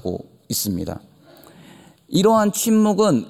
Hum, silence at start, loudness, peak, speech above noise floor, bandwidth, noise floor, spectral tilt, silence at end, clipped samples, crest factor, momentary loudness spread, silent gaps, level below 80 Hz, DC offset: none; 0.05 s; -19 LUFS; -4 dBFS; 29 dB; 17 kHz; -47 dBFS; -5 dB/octave; 0 s; under 0.1%; 16 dB; 16 LU; none; -58 dBFS; under 0.1%